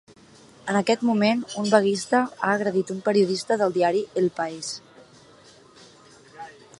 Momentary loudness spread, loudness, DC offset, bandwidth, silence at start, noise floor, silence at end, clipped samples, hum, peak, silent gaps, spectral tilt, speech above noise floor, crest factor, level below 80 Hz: 14 LU; -23 LUFS; under 0.1%; 11.5 kHz; 0.65 s; -51 dBFS; 0.3 s; under 0.1%; none; -2 dBFS; none; -5 dB/octave; 29 dB; 22 dB; -70 dBFS